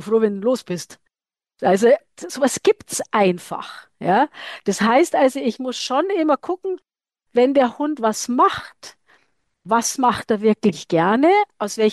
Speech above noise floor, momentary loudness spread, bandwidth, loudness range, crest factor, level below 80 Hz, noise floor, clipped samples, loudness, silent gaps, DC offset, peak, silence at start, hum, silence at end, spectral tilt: over 71 dB; 13 LU; 12.5 kHz; 1 LU; 14 dB; -64 dBFS; under -90 dBFS; under 0.1%; -19 LUFS; none; under 0.1%; -6 dBFS; 0 s; none; 0 s; -4.5 dB/octave